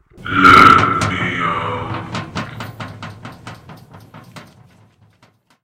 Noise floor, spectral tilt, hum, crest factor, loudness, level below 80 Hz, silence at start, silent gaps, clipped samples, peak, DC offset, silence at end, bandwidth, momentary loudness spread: -55 dBFS; -5 dB/octave; none; 16 dB; -12 LUFS; -42 dBFS; 0.2 s; none; 0.3%; 0 dBFS; under 0.1%; 1.2 s; 16.5 kHz; 26 LU